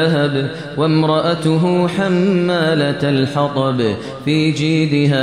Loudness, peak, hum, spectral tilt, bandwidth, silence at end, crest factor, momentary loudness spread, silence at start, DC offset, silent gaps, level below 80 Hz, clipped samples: -16 LUFS; -4 dBFS; none; -7 dB/octave; 10.5 kHz; 0 s; 12 dB; 4 LU; 0 s; 0.2%; none; -54 dBFS; under 0.1%